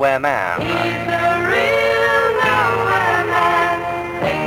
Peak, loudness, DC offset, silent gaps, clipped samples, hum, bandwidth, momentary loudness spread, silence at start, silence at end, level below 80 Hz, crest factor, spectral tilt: -2 dBFS; -16 LUFS; under 0.1%; none; under 0.1%; none; 17 kHz; 4 LU; 0 s; 0 s; -44 dBFS; 14 dB; -5 dB/octave